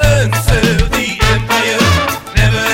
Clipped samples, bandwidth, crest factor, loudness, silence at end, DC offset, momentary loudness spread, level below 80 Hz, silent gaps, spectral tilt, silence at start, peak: under 0.1%; 17 kHz; 12 dB; -12 LUFS; 0 s; under 0.1%; 3 LU; -20 dBFS; none; -4.5 dB/octave; 0 s; 0 dBFS